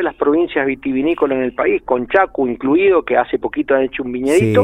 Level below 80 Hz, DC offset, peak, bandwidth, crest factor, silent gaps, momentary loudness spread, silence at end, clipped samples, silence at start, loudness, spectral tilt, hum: -46 dBFS; under 0.1%; 0 dBFS; 13 kHz; 16 dB; none; 6 LU; 0 s; under 0.1%; 0 s; -16 LUFS; -6.5 dB/octave; none